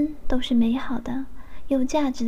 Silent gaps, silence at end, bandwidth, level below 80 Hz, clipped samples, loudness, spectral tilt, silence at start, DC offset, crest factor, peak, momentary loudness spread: none; 0 s; 11.5 kHz; -36 dBFS; under 0.1%; -25 LUFS; -5 dB/octave; 0 s; 3%; 14 dB; -8 dBFS; 11 LU